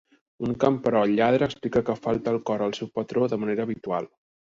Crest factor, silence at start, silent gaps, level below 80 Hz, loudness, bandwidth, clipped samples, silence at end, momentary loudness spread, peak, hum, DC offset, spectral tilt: 18 dB; 0.4 s; none; -58 dBFS; -25 LUFS; 7.6 kHz; under 0.1%; 0.45 s; 10 LU; -8 dBFS; none; under 0.1%; -7 dB/octave